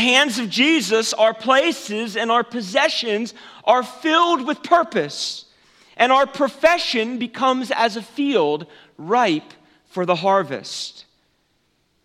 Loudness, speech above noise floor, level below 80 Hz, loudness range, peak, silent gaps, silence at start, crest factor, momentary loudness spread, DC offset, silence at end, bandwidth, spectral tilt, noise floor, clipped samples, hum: -19 LUFS; 46 dB; -66 dBFS; 3 LU; 0 dBFS; none; 0 s; 20 dB; 11 LU; under 0.1%; 1.05 s; 15.5 kHz; -3 dB/octave; -65 dBFS; under 0.1%; none